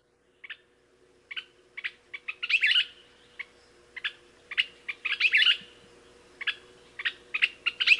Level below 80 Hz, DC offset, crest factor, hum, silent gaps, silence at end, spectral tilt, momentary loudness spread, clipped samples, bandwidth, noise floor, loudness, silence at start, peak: -72 dBFS; under 0.1%; 24 dB; none; none; 0 s; 1 dB/octave; 23 LU; under 0.1%; 11.5 kHz; -63 dBFS; -27 LUFS; 0.5 s; -8 dBFS